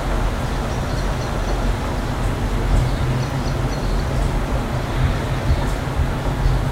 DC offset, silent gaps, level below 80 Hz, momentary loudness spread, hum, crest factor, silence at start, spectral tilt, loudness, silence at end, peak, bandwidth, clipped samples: under 0.1%; none; -22 dBFS; 3 LU; none; 14 dB; 0 s; -6 dB/octave; -22 LUFS; 0 s; -6 dBFS; 15.5 kHz; under 0.1%